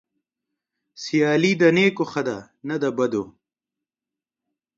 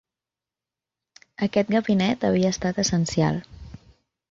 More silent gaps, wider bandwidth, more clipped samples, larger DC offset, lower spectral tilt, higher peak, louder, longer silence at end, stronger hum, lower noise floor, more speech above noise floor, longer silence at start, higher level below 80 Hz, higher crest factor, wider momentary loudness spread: neither; about the same, 7.8 kHz vs 7.8 kHz; neither; neither; about the same, -5.5 dB/octave vs -5.5 dB/octave; first, -4 dBFS vs -8 dBFS; about the same, -21 LUFS vs -23 LUFS; first, 1.45 s vs 0.55 s; neither; about the same, -89 dBFS vs -90 dBFS; about the same, 69 dB vs 67 dB; second, 1 s vs 1.4 s; second, -68 dBFS vs -50 dBFS; about the same, 20 dB vs 18 dB; first, 15 LU vs 9 LU